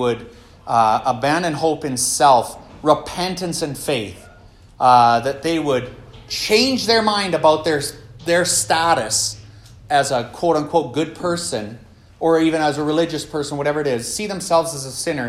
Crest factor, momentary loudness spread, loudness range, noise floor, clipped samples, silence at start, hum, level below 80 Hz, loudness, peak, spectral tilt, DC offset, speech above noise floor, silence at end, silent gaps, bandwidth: 18 dB; 10 LU; 4 LU; -45 dBFS; under 0.1%; 0 s; none; -50 dBFS; -18 LUFS; 0 dBFS; -3.5 dB/octave; under 0.1%; 27 dB; 0 s; none; 16 kHz